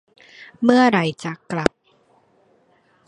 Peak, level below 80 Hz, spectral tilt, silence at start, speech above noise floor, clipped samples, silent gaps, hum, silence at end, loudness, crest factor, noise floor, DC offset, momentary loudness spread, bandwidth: 0 dBFS; -52 dBFS; -6 dB/octave; 0.4 s; 42 dB; under 0.1%; none; none; 1.4 s; -19 LUFS; 22 dB; -59 dBFS; under 0.1%; 12 LU; 10.5 kHz